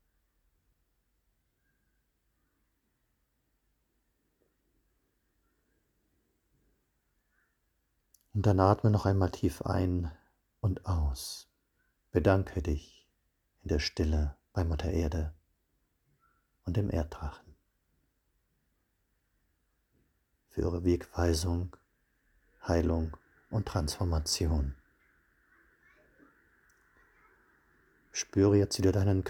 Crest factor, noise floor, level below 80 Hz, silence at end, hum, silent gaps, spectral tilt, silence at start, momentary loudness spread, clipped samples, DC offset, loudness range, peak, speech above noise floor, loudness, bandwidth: 26 dB; -77 dBFS; -44 dBFS; 0 s; none; none; -6 dB/octave; 8.35 s; 14 LU; under 0.1%; under 0.1%; 10 LU; -8 dBFS; 48 dB; -31 LUFS; 16.5 kHz